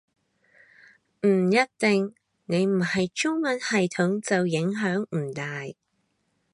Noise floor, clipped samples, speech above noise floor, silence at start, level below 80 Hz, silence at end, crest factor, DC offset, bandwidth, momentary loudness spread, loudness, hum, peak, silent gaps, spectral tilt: -73 dBFS; under 0.1%; 49 dB; 1.25 s; -70 dBFS; 0.8 s; 18 dB; under 0.1%; 11 kHz; 10 LU; -25 LUFS; none; -8 dBFS; none; -5.5 dB/octave